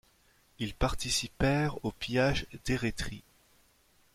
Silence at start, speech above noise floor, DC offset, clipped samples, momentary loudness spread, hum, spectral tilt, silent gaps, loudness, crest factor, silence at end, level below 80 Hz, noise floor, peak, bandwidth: 0.6 s; 35 dB; under 0.1%; under 0.1%; 11 LU; none; -4.5 dB/octave; none; -32 LUFS; 18 dB; 0.95 s; -44 dBFS; -66 dBFS; -14 dBFS; 16 kHz